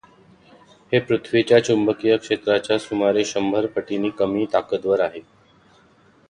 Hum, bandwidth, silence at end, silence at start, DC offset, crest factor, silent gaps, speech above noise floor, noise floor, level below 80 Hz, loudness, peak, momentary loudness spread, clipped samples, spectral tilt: none; 10 kHz; 1.1 s; 0.9 s; under 0.1%; 18 dB; none; 35 dB; -55 dBFS; -60 dBFS; -21 LUFS; -2 dBFS; 7 LU; under 0.1%; -5 dB/octave